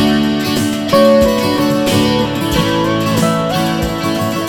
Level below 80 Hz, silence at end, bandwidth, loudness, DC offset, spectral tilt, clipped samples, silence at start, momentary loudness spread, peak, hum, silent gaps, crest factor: -34 dBFS; 0 s; over 20 kHz; -13 LUFS; under 0.1%; -5 dB/octave; under 0.1%; 0 s; 6 LU; 0 dBFS; none; none; 14 dB